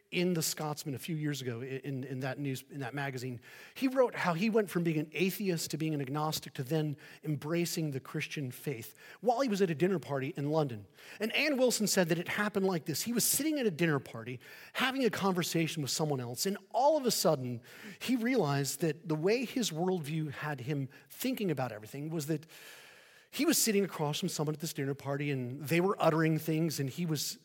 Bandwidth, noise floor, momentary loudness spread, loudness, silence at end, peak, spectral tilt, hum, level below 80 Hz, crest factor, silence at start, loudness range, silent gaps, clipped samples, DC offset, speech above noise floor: 17 kHz; -58 dBFS; 12 LU; -33 LUFS; 0.05 s; -12 dBFS; -4.5 dB/octave; none; -80 dBFS; 20 dB; 0.1 s; 5 LU; none; under 0.1%; under 0.1%; 25 dB